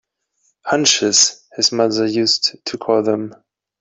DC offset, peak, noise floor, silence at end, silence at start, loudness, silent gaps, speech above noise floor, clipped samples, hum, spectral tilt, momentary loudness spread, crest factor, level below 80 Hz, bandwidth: under 0.1%; 0 dBFS; -65 dBFS; 0.45 s; 0.65 s; -16 LUFS; none; 48 dB; under 0.1%; none; -2 dB/octave; 11 LU; 18 dB; -64 dBFS; 8.4 kHz